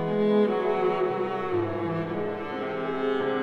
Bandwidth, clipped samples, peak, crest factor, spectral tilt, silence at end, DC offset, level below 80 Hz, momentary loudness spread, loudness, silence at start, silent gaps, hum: 6.2 kHz; under 0.1%; -12 dBFS; 14 dB; -8 dB/octave; 0 s; under 0.1%; -62 dBFS; 8 LU; -27 LUFS; 0 s; none; none